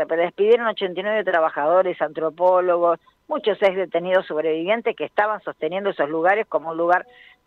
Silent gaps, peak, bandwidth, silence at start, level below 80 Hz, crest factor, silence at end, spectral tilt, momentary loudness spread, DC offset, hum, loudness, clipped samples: none; -6 dBFS; 5.4 kHz; 0 s; -72 dBFS; 14 dB; 0.45 s; -6.5 dB/octave; 7 LU; under 0.1%; none; -21 LUFS; under 0.1%